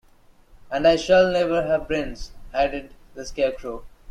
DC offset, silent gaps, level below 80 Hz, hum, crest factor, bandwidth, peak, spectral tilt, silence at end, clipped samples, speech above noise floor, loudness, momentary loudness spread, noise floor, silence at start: under 0.1%; none; -42 dBFS; none; 18 dB; 10.5 kHz; -6 dBFS; -5 dB/octave; 0 s; under 0.1%; 32 dB; -22 LUFS; 18 LU; -53 dBFS; 0.55 s